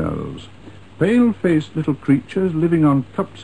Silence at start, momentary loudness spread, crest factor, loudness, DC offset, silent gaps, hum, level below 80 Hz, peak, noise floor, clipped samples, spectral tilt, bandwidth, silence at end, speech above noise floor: 0 s; 11 LU; 14 dB; -18 LUFS; 0.6%; none; none; -46 dBFS; -4 dBFS; -41 dBFS; under 0.1%; -8.5 dB/octave; 11 kHz; 0 s; 24 dB